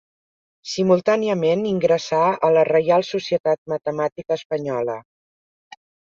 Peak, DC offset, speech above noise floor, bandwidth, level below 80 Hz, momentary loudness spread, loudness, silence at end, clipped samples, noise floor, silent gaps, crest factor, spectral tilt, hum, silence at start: -6 dBFS; under 0.1%; over 70 dB; 7.4 kHz; -64 dBFS; 9 LU; -20 LUFS; 1.1 s; under 0.1%; under -90 dBFS; 3.40-3.44 s, 3.58-3.66 s, 4.12-4.16 s, 4.45-4.50 s; 16 dB; -6 dB/octave; none; 0.65 s